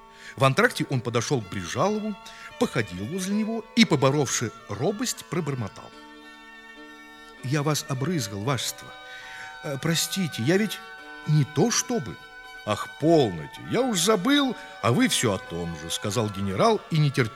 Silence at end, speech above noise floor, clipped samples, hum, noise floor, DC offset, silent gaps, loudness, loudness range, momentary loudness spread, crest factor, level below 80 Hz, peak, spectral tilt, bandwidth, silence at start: 0 s; 21 dB; under 0.1%; none; -46 dBFS; under 0.1%; none; -25 LUFS; 7 LU; 20 LU; 22 dB; -60 dBFS; -4 dBFS; -4.5 dB/octave; 16 kHz; 0.05 s